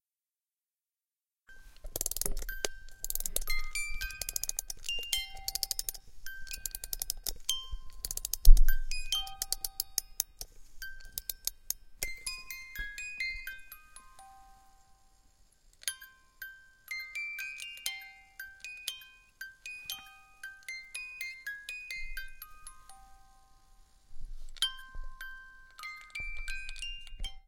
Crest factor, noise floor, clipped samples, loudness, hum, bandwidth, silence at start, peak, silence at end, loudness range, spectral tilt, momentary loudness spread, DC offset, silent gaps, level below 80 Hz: 30 dB; under -90 dBFS; under 0.1%; -37 LUFS; none; 17 kHz; 1.5 s; -4 dBFS; 0.1 s; 10 LU; -0.5 dB/octave; 17 LU; under 0.1%; none; -34 dBFS